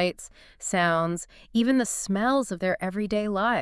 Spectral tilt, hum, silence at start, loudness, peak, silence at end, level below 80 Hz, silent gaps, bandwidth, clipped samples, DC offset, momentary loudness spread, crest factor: -4.5 dB/octave; none; 0 s; -26 LUFS; -10 dBFS; 0 s; -54 dBFS; none; 12 kHz; under 0.1%; under 0.1%; 11 LU; 16 dB